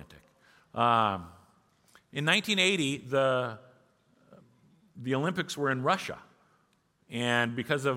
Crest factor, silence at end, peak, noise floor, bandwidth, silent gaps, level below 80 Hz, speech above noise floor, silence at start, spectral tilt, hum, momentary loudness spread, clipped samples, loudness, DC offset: 22 dB; 0 s; -10 dBFS; -70 dBFS; 16.5 kHz; none; -70 dBFS; 42 dB; 0 s; -4 dB/octave; none; 15 LU; under 0.1%; -28 LUFS; under 0.1%